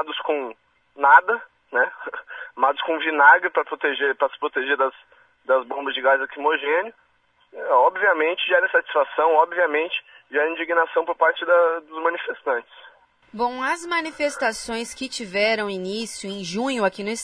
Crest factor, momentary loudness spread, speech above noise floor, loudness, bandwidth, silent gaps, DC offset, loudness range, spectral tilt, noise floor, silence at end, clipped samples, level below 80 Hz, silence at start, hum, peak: 22 dB; 12 LU; 37 dB; -21 LUFS; 11 kHz; none; under 0.1%; 6 LU; -3 dB/octave; -58 dBFS; 0 s; under 0.1%; -66 dBFS; 0 s; none; 0 dBFS